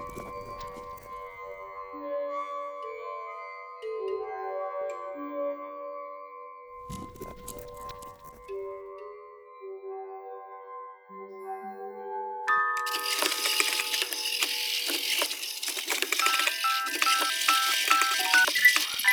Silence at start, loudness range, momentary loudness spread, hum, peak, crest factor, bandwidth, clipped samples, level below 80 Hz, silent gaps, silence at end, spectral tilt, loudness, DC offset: 0 s; 17 LU; 21 LU; none; -4 dBFS; 26 dB; over 20 kHz; under 0.1%; -62 dBFS; none; 0 s; 0.5 dB/octave; -26 LUFS; under 0.1%